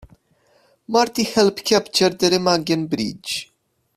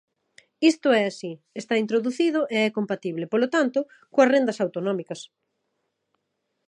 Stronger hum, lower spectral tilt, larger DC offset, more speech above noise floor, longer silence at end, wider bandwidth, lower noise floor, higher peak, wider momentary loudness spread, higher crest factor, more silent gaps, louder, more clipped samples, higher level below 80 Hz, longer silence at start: neither; about the same, -4 dB/octave vs -5 dB/octave; neither; second, 41 dB vs 54 dB; second, 0.55 s vs 1.45 s; first, 15.5 kHz vs 11 kHz; second, -60 dBFS vs -77 dBFS; first, -2 dBFS vs -6 dBFS; second, 9 LU vs 12 LU; about the same, 20 dB vs 20 dB; neither; first, -19 LUFS vs -23 LUFS; neither; first, -56 dBFS vs -82 dBFS; first, 0.9 s vs 0.6 s